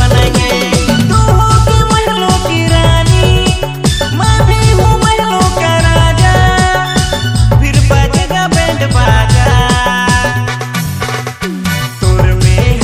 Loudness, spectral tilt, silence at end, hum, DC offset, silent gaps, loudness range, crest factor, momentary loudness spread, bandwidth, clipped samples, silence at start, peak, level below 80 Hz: -10 LUFS; -5 dB/octave; 0 s; none; under 0.1%; none; 2 LU; 8 dB; 7 LU; 15.5 kHz; 0.9%; 0 s; 0 dBFS; -16 dBFS